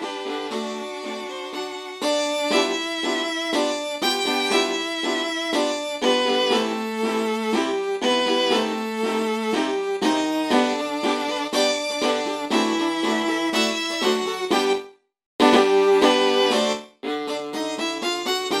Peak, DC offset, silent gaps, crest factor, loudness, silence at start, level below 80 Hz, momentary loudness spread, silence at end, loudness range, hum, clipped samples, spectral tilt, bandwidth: -2 dBFS; under 0.1%; 15.26-15.39 s; 20 dB; -22 LUFS; 0 s; -66 dBFS; 10 LU; 0 s; 3 LU; none; under 0.1%; -2.5 dB/octave; 18.5 kHz